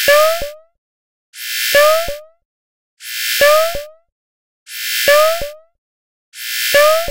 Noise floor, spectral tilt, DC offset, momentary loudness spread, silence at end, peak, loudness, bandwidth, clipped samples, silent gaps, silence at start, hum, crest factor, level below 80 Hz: under -90 dBFS; 0 dB/octave; 1%; 18 LU; 0 s; 0 dBFS; -13 LUFS; 16 kHz; under 0.1%; 0.78-1.33 s, 2.45-2.97 s, 4.12-4.66 s, 5.78-6.32 s; 0 s; none; 16 dB; -42 dBFS